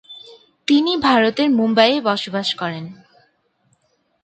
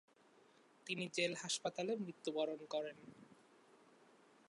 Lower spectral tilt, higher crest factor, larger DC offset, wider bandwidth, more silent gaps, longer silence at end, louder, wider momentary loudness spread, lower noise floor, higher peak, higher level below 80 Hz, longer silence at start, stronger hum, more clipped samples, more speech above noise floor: first, -5 dB/octave vs -3 dB/octave; about the same, 20 dB vs 20 dB; neither; second, 9 kHz vs 11 kHz; neither; first, 1.3 s vs 0.75 s; first, -17 LUFS vs -42 LUFS; about the same, 19 LU vs 18 LU; second, -64 dBFS vs -69 dBFS; first, 0 dBFS vs -24 dBFS; first, -60 dBFS vs under -90 dBFS; second, 0.1 s vs 0.85 s; neither; neither; first, 48 dB vs 27 dB